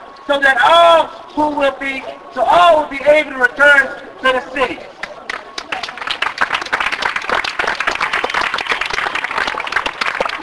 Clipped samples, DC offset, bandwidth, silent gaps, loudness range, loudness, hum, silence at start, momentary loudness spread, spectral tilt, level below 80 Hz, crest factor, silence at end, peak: under 0.1%; under 0.1%; 11 kHz; none; 7 LU; -14 LUFS; none; 0 s; 14 LU; -2.5 dB/octave; -48 dBFS; 16 dB; 0 s; 0 dBFS